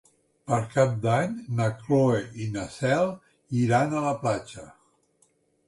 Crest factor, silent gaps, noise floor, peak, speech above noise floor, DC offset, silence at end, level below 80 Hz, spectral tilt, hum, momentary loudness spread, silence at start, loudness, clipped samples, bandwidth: 18 dB; none; -67 dBFS; -8 dBFS; 42 dB; under 0.1%; 0.95 s; -58 dBFS; -7 dB/octave; none; 10 LU; 0.45 s; -26 LUFS; under 0.1%; 11.5 kHz